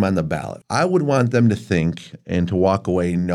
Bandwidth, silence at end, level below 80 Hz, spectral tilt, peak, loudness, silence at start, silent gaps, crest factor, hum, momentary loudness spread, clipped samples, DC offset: 11.5 kHz; 0 s; -46 dBFS; -7 dB/octave; -4 dBFS; -20 LUFS; 0 s; none; 14 dB; none; 8 LU; under 0.1%; under 0.1%